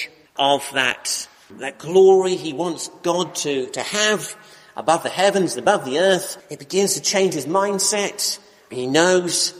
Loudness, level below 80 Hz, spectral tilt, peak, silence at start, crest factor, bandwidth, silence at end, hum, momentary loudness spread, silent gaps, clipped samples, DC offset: -19 LUFS; -68 dBFS; -2.5 dB/octave; -2 dBFS; 0 s; 18 dB; 15.5 kHz; 0 s; none; 14 LU; none; under 0.1%; under 0.1%